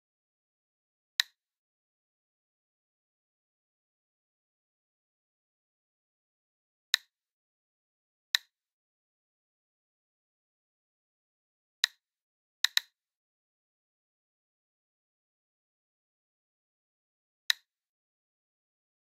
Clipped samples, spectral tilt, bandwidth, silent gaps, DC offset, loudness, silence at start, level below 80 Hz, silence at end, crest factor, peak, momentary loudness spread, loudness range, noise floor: under 0.1%; 8 dB/octave; 13 kHz; 1.57-6.93 s, 7.31-8.34 s, 8.72-11.83 s, 12.21-12.64 s, 13.15-17.49 s; under 0.1%; -32 LUFS; 1.2 s; under -90 dBFS; 1.6 s; 36 dB; -6 dBFS; 3 LU; 5 LU; under -90 dBFS